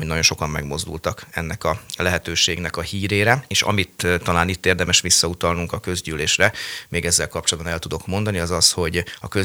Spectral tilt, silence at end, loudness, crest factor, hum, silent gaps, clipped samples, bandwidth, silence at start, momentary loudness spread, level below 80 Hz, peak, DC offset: -2.5 dB/octave; 0 s; -20 LUFS; 22 dB; none; none; under 0.1%; over 20 kHz; 0 s; 10 LU; -40 dBFS; 0 dBFS; under 0.1%